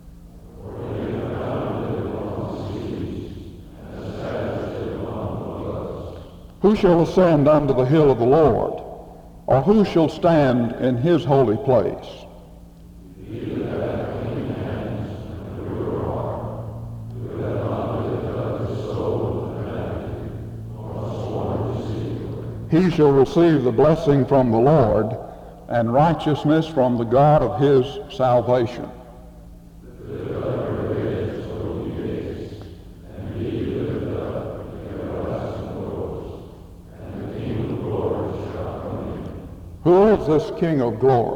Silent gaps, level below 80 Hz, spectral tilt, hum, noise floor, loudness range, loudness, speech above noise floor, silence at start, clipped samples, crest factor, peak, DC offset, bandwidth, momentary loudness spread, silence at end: none; -42 dBFS; -8.5 dB/octave; none; -43 dBFS; 11 LU; -21 LUFS; 26 dB; 0.05 s; under 0.1%; 18 dB; -4 dBFS; under 0.1%; 12 kHz; 18 LU; 0 s